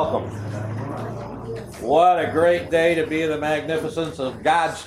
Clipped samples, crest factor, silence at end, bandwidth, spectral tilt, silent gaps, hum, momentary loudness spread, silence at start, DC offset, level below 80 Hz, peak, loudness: under 0.1%; 16 dB; 0 s; 14 kHz; -5.5 dB/octave; none; none; 14 LU; 0 s; under 0.1%; -50 dBFS; -6 dBFS; -21 LUFS